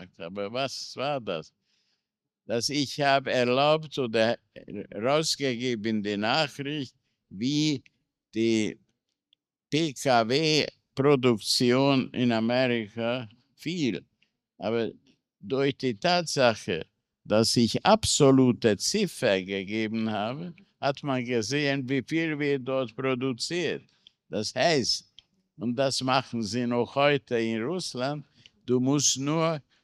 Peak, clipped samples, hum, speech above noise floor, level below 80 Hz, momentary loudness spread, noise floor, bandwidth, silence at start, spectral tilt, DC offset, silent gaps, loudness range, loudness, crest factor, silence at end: -6 dBFS; under 0.1%; none; 59 dB; -64 dBFS; 12 LU; -85 dBFS; 14.5 kHz; 0 s; -4 dB/octave; under 0.1%; none; 6 LU; -26 LUFS; 22 dB; 0.25 s